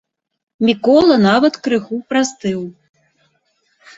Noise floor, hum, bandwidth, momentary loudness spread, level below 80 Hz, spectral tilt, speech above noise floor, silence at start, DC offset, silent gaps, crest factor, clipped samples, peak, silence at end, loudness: -63 dBFS; none; 8 kHz; 12 LU; -56 dBFS; -5 dB/octave; 49 dB; 0.6 s; under 0.1%; none; 16 dB; under 0.1%; -2 dBFS; 1.25 s; -15 LUFS